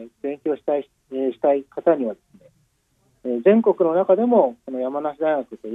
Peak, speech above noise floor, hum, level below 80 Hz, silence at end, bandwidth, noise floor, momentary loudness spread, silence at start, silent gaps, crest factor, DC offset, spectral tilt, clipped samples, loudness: -4 dBFS; 44 dB; none; -72 dBFS; 0 s; 3.9 kHz; -65 dBFS; 12 LU; 0 s; none; 18 dB; under 0.1%; -9 dB/octave; under 0.1%; -21 LUFS